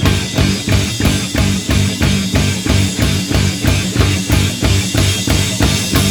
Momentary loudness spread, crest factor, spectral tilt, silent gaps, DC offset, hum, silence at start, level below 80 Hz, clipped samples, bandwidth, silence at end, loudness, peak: 2 LU; 14 dB; -4.5 dB/octave; none; under 0.1%; none; 0 s; -22 dBFS; under 0.1%; over 20 kHz; 0 s; -14 LUFS; 0 dBFS